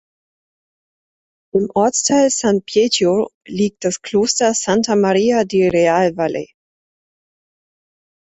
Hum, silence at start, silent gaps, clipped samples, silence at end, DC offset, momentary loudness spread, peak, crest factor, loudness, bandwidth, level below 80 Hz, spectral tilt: none; 1.55 s; 3.34-3.41 s; under 0.1%; 1.85 s; under 0.1%; 8 LU; -2 dBFS; 16 dB; -16 LUFS; 8.4 kHz; -56 dBFS; -4 dB/octave